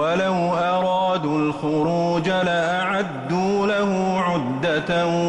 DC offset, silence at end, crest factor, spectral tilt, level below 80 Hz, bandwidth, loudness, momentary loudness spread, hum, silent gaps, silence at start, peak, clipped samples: under 0.1%; 0 s; 10 dB; -6 dB/octave; -54 dBFS; 10.5 kHz; -21 LUFS; 2 LU; none; none; 0 s; -10 dBFS; under 0.1%